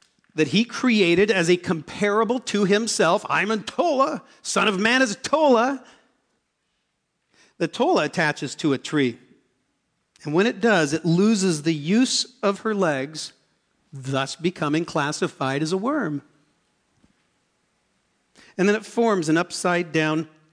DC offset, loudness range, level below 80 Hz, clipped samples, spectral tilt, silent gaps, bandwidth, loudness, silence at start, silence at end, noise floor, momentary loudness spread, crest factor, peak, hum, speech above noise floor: under 0.1%; 6 LU; -68 dBFS; under 0.1%; -4.5 dB/octave; none; 11 kHz; -22 LUFS; 0.35 s; 0.25 s; -74 dBFS; 9 LU; 16 dB; -6 dBFS; none; 53 dB